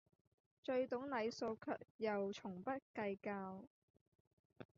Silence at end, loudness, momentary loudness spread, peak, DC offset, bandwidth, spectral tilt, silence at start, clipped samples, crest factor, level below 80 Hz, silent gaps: 0.15 s; -45 LUFS; 9 LU; -30 dBFS; under 0.1%; 7.2 kHz; -4.5 dB/octave; 0.65 s; under 0.1%; 16 dB; -84 dBFS; 1.90-1.99 s, 2.82-2.94 s, 3.67-3.94 s, 4.01-4.50 s